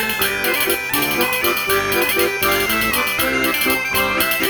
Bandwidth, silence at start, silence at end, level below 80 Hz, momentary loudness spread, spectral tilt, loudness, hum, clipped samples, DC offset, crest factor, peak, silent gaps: over 20 kHz; 0 s; 0 s; -42 dBFS; 1 LU; -2 dB/octave; -16 LUFS; none; under 0.1%; under 0.1%; 14 dB; -4 dBFS; none